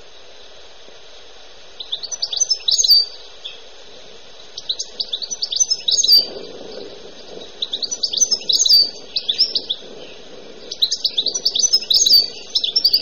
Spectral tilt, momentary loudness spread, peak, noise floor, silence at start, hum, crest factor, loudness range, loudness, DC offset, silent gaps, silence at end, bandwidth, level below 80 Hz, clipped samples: 2 dB/octave; 24 LU; -6 dBFS; -43 dBFS; 1.15 s; none; 14 dB; 3 LU; -15 LUFS; 1%; none; 0 s; over 20 kHz; -54 dBFS; under 0.1%